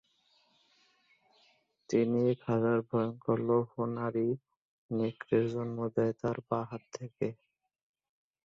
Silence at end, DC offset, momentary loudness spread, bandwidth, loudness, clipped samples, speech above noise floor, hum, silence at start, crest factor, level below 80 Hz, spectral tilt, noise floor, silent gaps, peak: 1.1 s; under 0.1%; 9 LU; 7.6 kHz; -33 LUFS; under 0.1%; 39 dB; none; 1.9 s; 20 dB; -72 dBFS; -8.5 dB/octave; -71 dBFS; 4.57-4.89 s; -14 dBFS